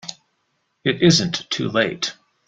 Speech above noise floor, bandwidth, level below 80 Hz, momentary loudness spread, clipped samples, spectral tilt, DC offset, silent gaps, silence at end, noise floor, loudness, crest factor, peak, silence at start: 51 dB; 9.2 kHz; -54 dBFS; 11 LU; under 0.1%; -4 dB/octave; under 0.1%; none; 0.35 s; -70 dBFS; -20 LUFS; 20 dB; -2 dBFS; 0.05 s